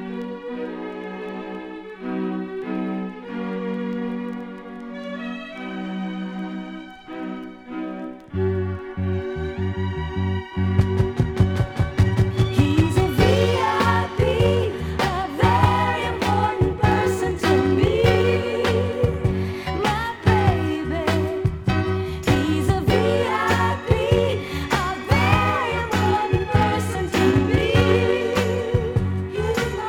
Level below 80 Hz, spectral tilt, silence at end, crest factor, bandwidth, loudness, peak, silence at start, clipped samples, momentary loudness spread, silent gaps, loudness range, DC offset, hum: -36 dBFS; -6.5 dB/octave; 0 s; 16 dB; 16.5 kHz; -22 LUFS; -4 dBFS; 0 s; under 0.1%; 14 LU; none; 10 LU; under 0.1%; none